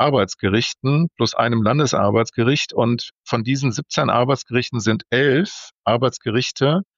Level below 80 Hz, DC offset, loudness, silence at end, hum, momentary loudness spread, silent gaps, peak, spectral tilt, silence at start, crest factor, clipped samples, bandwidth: -58 dBFS; under 0.1%; -19 LUFS; 0.15 s; none; 4 LU; 3.18-3.23 s, 5.72-5.82 s; -4 dBFS; -5.5 dB/octave; 0 s; 16 dB; under 0.1%; 7.6 kHz